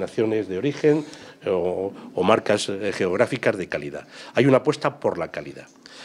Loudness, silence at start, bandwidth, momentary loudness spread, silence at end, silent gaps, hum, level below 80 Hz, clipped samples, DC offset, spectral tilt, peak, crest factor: -23 LUFS; 0 s; 12 kHz; 15 LU; 0 s; none; none; -66 dBFS; under 0.1%; under 0.1%; -5.5 dB/octave; 0 dBFS; 22 dB